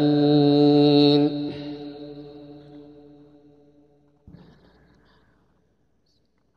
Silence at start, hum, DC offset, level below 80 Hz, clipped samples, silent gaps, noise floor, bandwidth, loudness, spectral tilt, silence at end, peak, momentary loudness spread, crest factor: 0 s; none; under 0.1%; -64 dBFS; under 0.1%; none; -68 dBFS; 5.6 kHz; -18 LUFS; -9 dB/octave; 3.75 s; -4 dBFS; 26 LU; 20 dB